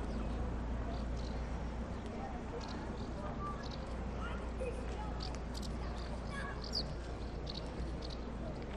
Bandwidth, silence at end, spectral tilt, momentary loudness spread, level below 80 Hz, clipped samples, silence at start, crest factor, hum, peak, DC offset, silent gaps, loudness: 11 kHz; 0 s; -6 dB/octave; 3 LU; -44 dBFS; under 0.1%; 0 s; 14 dB; none; -26 dBFS; under 0.1%; none; -42 LUFS